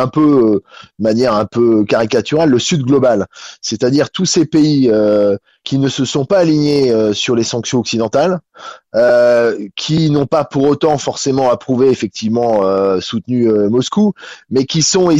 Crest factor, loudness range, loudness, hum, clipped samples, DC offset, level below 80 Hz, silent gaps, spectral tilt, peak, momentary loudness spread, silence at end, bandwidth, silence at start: 10 dB; 1 LU; -13 LUFS; none; under 0.1%; under 0.1%; -50 dBFS; none; -5 dB/octave; -2 dBFS; 7 LU; 0 s; 8.2 kHz; 0 s